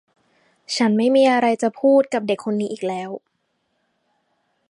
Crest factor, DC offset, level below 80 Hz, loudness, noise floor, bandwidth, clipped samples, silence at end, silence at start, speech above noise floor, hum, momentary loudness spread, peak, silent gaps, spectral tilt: 16 dB; under 0.1%; -74 dBFS; -19 LUFS; -71 dBFS; 11.5 kHz; under 0.1%; 1.5 s; 0.7 s; 53 dB; none; 13 LU; -6 dBFS; none; -5 dB/octave